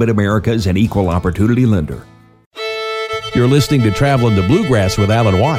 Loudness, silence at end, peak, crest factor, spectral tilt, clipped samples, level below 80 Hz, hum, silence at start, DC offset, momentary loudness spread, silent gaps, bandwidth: -14 LUFS; 0 s; -2 dBFS; 12 dB; -6.5 dB/octave; under 0.1%; -34 dBFS; none; 0 s; under 0.1%; 8 LU; 2.46-2.51 s; 15.5 kHz